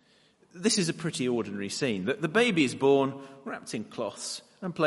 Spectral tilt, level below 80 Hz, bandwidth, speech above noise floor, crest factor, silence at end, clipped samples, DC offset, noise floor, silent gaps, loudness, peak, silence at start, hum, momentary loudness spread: -4 dB/octave; -72 dBFS; 11.5 kHz; 35 dB; 18 dB; 0 s; under 0.1%; under 0.1%; -63 dBFS; none; -28 LUFS; -10 dBFS; 0.55 s; none; 13 LU